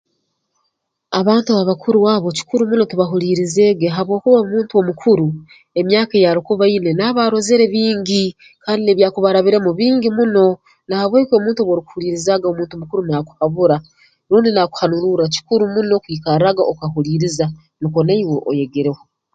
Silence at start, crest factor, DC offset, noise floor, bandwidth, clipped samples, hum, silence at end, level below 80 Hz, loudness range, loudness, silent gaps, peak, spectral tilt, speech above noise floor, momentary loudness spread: 1.1 s; 16 dB; under 0.1%; -71 dBFS; 9.2 kHz; under 0.1%; none; 0.4 s; -56 dBFS; 3 LU; -16 LUFS; none; 0 dBFS; -6 dB/octave; 56 dB; 8 LU